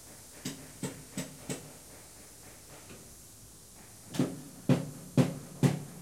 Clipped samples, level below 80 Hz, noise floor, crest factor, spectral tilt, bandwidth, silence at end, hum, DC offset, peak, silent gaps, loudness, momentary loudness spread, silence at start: under 0.1%; -64 dBFS; -53 dBFS; 24 dB; -6 dB/octave; 16.5 kHz; 0 s; none; under 0.1%; -10 dBFS; none; -34 LUFS; 20 LU; 0 s